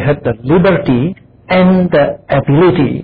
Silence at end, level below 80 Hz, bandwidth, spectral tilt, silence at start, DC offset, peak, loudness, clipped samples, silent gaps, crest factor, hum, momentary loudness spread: 0 s; -36 dBFS; 4.9 kHz; -11 dB/octave; 0 s; under 0.1%; -2 dBFS; -11 LUFS; under 0.1%; none; 8 dB; none; 6 LU